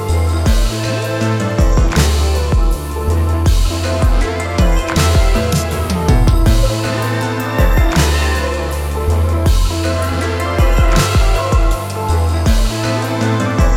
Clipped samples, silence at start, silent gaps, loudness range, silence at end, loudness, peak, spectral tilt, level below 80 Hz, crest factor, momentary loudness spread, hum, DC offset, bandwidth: under 0.1%; 0 s; none; 1 LU; 0 s; -15 LUFS; 0 dBFS; -5.5 dB/octave; -16 dBFS; 12 dB; 5 LU; none; under 0.1%; 16.5 kHz